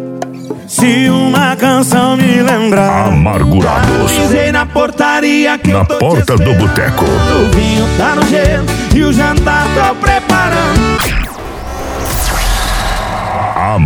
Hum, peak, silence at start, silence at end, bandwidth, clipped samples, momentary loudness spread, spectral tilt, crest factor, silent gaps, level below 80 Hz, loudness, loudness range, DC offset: none; 0 dBFS; 0 s; 0 s; 19 kHz; under 0.1%; 7 LU; -5 dB/octave; 10 dB; none; -20 dBFS; -10 LUFS; 3 LU; under 0.1%